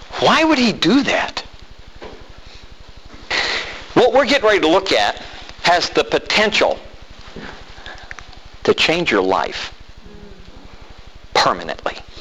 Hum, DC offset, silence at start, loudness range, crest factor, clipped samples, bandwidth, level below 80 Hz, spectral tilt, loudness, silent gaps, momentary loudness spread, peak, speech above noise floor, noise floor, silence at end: none; 1%; 0 s; 5 LU; 16 dB; under 0.1%; 13.5 kHz; -42 dBFS; -3.5 dB/octave; -16 LUFS; none; 22 LU; -2 dBFS; 24 dB; -40 dBFS; 0 s